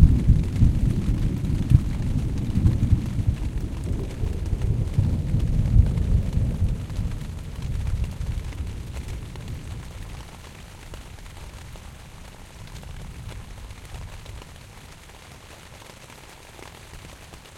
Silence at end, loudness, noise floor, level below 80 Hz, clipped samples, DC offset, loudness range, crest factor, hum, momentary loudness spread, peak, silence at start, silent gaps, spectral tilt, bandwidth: 0 s; -25 LUFS; -44 dBFS; -28 dBFS; under 0.1%; under 0.1%; 17 LU; 24 dB; none; 22 LU; 0 dBFS; 0 s; none; -7.5 dB/octave; 14 kHz